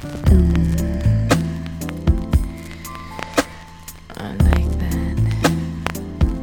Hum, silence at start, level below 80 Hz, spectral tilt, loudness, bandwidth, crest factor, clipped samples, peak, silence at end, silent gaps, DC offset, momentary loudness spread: none; 0 s; -22 dBFS; -6.5 dB/octave; -20 LUFS; 18.5 kHz; 16 dB; under 0.1%; -2 dBFS; 0 s; none; under 0.1%; 16 LU